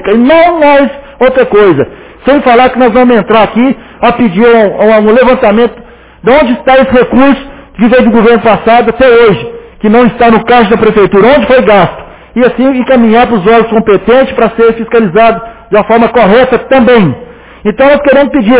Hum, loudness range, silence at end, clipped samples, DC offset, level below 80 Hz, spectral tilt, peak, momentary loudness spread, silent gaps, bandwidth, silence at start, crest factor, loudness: none; 1 LU; 0 s; 7%; under 0.1%; -32 dBFS; -10 dB/octave; 0 dBFS; 7 LU; none; 4 kHz; 0 s; 6 dB; -6 LUFS